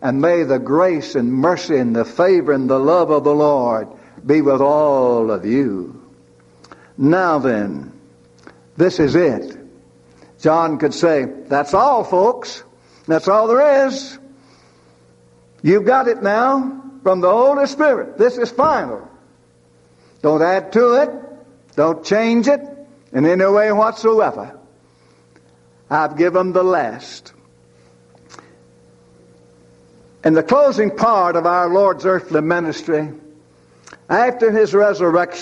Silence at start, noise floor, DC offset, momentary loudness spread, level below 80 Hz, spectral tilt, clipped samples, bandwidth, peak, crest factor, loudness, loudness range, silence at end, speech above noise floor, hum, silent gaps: 0 s; -52 dBFS; under 0.1%; 12 LU; -56 dBFS; -6.5 dB/octave; under 0.1%; 8.4 kHz; -2 dBFS; 14 dB; -16 LUFS; 5 LU; 0 s; 37 dB; none; none